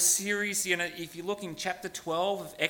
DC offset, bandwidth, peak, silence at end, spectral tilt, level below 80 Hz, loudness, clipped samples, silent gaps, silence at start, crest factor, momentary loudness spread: under 0.1%; 17.5 kHz; -10 dBFS; 0 s; -1.5 dB/octave; -68 dBFS; -30 LUFS; under 0.1%; none; 0 s; 20 dB; 9 LU